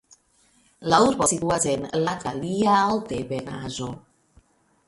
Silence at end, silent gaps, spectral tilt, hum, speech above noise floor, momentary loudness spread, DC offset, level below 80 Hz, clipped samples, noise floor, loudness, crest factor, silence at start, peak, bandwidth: 0.9 s; none; -4 dB/octave; none; 39 dB; 14 LU; under 0.1%; -54 dBFS; under 0.1%; -62 dBFS; -23 LUFS; 22 dB; 0.8 s; -4 dBFS; 11.5 kHz